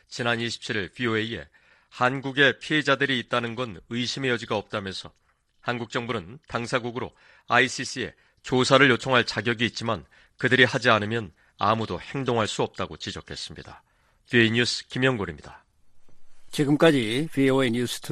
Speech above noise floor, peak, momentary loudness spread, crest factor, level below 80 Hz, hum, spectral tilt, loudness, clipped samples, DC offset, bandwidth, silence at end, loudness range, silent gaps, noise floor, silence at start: 23 dB; -2 dBFS; 15 LU; 22 dB; -58 dBFS; none; -4.5 dB/octave; -24 LUFS; under 0.1%; under 0.1%; 13.5 kHz; 0 s; 7 LU; none; -48 dBFS; 0.1 s